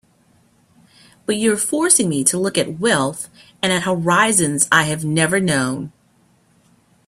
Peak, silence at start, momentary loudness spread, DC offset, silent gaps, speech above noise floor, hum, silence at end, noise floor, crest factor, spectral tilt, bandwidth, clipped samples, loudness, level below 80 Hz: 0 dBFS; 1.3 s; 11 LU; under 0.1%; none; 39 dB; none; 1.2 s; -57 dBFS; 20 dB; -3 dB/octave; 15.5 kHz; under 0.1%; -17 LUFS; -58 dBFS